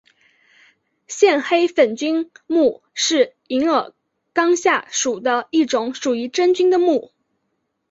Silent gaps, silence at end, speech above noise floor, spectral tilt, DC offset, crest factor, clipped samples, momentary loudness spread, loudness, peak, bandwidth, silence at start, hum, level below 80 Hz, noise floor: none; 0.85 s; 55 dB; -2 dB/octave; under 0.1%; 16 dB; under 0.1%; 7 LU; -18 LUFS; -2 dBFS; 8 kHz; 1.1 s; none; -68 dBFS; -72 dBFS